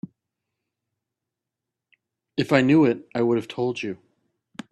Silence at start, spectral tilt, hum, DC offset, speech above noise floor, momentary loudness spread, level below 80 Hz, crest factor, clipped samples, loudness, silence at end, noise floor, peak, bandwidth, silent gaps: 2.35 s; -7 dB/octave; none; under 0.1%; 65 dB; 24 LU; -66 dBFS; 24 dB; under 0.1%; -22 LUFS; 0.75 s; -86 dBFS; -2 dBFS; 11.5 kHz; none